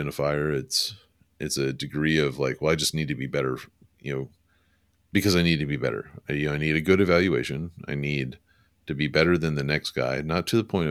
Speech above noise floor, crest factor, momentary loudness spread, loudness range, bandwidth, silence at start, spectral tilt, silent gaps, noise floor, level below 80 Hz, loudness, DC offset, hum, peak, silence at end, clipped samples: 41 dB; 20 dB; 12 LU; 3 LU; 15.5 kHz; 0 s; -5 dB/octave; none; -66 dBFS; -50 dBFS; -25 LUFS; under 0.1%; none; -6 dBFS; 0 s; under 0.1%